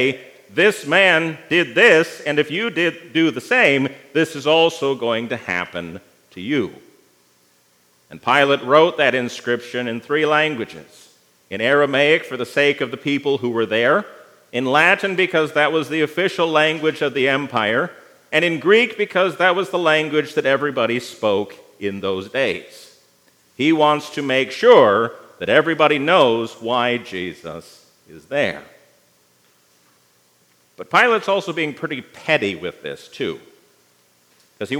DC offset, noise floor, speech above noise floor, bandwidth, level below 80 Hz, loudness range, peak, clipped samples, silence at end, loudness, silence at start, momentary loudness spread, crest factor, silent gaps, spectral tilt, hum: under 0.1%; -58 dBFS; 40 dB; 16 kHz; -72 dBFS; 8 LU; 0 dBFS; under 0.1%; 0 s; -18 LUFS; 0 s; 14 LU; 18 dB; none; -4.5 dB/octave; 60 Hz at -60 dBFS